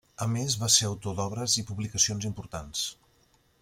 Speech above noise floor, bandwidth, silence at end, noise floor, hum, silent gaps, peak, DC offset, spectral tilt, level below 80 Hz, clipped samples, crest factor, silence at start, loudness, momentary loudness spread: 36 dB; 16.5 kHz; 0.7 s; -65 dBFS; none; none; -8 dBFS; under 0.1%; -2.5 dB/octave; -56 dBFS; under 0.1%; 24 dB; 0.2 s; -27 LUFS; 13 LU